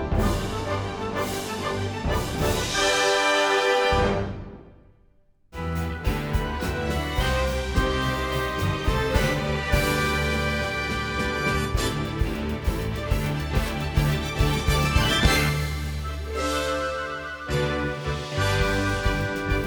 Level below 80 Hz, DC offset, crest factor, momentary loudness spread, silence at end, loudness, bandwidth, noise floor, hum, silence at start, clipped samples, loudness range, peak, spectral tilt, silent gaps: -32 dBFS; under 0.1%; 18 dB; 9 LU; 0 s; -25 LUFS; over 20 kHz; -58 dBFS; none; 0 s; under 0.1%; 4 LU; -6 dBFS; -4.5 dB/octave; none